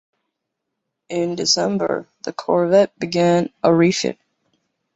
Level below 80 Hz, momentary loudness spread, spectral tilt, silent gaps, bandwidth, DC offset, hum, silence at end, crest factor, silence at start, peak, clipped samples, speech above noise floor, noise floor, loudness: -62 dBFS; 11 LU; -4.5 dB/octave; none; 8.2 kHz; under 0.1%; none; 0.8 s; 18 dB; 1.1 s; -2 dBFS; under 0.1%; 61 dB; -79 dBFS; -18 LUFS